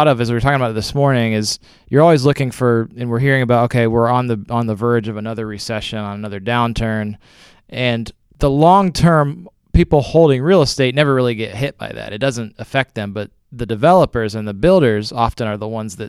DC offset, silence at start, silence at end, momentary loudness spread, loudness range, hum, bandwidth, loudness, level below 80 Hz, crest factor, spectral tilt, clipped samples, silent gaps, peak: under 0.1%; 0 s; 0 s; 13 LU; 6 LU; none; 14 kHz; -16 LUFS; -34 dBFS; 16 dB; -6.5 dB/octave; under 0.1%; none; 0 dBFS